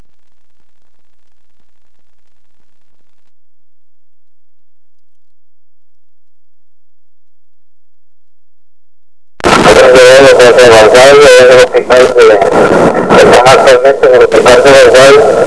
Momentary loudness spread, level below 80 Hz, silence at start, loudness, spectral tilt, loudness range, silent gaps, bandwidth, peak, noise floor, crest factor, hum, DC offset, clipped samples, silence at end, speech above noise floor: 5 LU; -36 dBFS; 9.45 s; -3 LUFS; -3.5 dB/octave; 7 LU; none; 11 kHz; 0 dBFS; -70 dBFS; 6 dB; none; 4%; 20%; 0 s; 67 dB